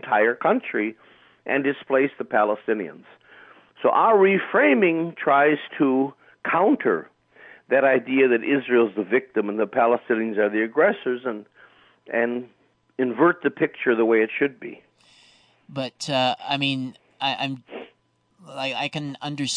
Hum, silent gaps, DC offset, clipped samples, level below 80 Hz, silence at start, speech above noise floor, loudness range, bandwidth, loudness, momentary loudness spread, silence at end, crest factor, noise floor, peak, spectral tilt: none; none; under 0.1%; under 0.1%; -78 dBFS; 0 s; 43 dB; 7 LU; 10 kHz; -22 LUFS; 13 LU; 0 s; 16 dB; -65 dBFS; -8 dBFS; -5 dB/octave